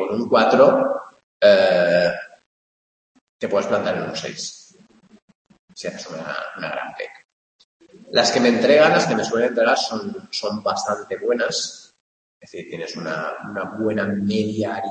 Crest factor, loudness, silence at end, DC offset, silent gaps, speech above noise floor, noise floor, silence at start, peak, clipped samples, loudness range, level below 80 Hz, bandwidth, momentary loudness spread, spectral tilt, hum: 20 dB; -20 LUFS; 0 s; under 0.1%; 1.23-1.40 s, 2.46-3.15 s, 3.21-3.39 s, 5.22-5.28 s, 5.35-5.45 s, 5.59-5.68 s, 7.25-7.80 s, 12.00-12.41 s; 33 dB; -52 dBFS; 0 s; -2 dBFS; under 0.1%; 12 LU; -66 dBFS; 8.8 kHz; 17 LU; -4 dB/octave; none